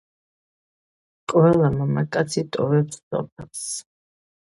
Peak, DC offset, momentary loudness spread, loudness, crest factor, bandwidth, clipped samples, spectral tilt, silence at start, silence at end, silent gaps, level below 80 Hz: -4 dBFS; under 0.1%; 15 LU; -22 LUFS; 18 dB; 11.5 kHz; under 0.1%; -6.5 dB/octave; 1.3 s; 0.6 s; 3.03-3.11 s, 3.32-3.36 s; -54 dBFS